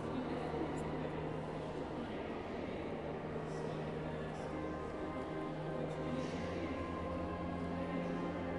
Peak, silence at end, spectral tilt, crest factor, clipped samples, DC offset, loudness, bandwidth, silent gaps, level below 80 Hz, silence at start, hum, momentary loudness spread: -28 dBFS; 0 s; -7 dB/octave; 14 dB; under 0.1%; under 0.1%; -42 LUFS; 11.5 kHz; none; -58 dBFS; 0 s; none; 3 LU